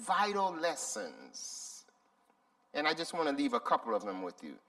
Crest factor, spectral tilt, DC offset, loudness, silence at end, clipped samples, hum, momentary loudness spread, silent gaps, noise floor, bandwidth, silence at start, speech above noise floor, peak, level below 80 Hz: 22 dB; -2.5 dB/octave; under 0.1%; -35 LUFS; 0.1 s; under 0.1%; none; 13 LU; none; -72 dBFS; 15 kHz; 0 s; 37 dB; -14 dBFS; -84 dBFS